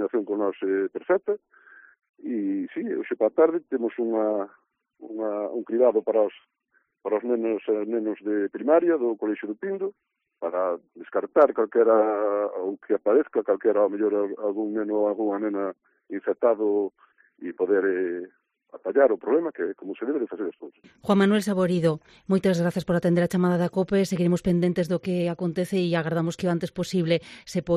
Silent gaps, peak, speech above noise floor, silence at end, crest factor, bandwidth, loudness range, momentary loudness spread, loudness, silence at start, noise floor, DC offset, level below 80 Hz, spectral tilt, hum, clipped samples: 2.09-2.14 s; -4 dBFS; 46 dB; 0 s; 20 dB; 13 kHz; 3 LU; 11 LU; -25 LUFS; 0 s; -70 dBFS; under 0.1%; -62 dBFS; -7.5 dB/octave; none; under 0.1%